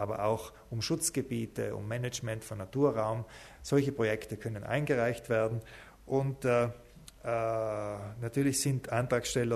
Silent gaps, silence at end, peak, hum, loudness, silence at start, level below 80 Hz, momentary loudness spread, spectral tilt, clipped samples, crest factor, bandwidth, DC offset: none; 0 s; -14 dBFS; none; -33 LUFS; 0 s; -58 dBFS; 10 LU; -5 dB/octave; under 0.1%; 18 dB; 13.5 kHz; under 0.1%